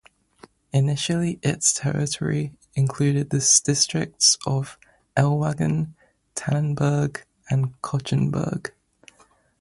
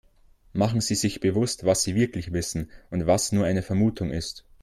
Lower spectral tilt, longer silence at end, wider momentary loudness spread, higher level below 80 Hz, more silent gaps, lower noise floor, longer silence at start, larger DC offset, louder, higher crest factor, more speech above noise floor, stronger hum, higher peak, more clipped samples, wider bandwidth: about the same, -4 dB/octave vs -5 dB/octave; first, 0.9 s vs 0.25 s; about the same, 12 LU vs 10 LU; second, -54 dBFS vs -48 dBFS; neither; about the same, -59 dBFS vs -56 dBFS; first, 0.75 s vs 0.55 s; neither; first, -22 LUFS vs -25 LUFS; about the same, 20 dB vs 16 dB; first, 37 dB vs 32 dB; neither; first, -2 dBFS vs -8 dBFS; neither; second, 11.5 kHz vs 15 kHz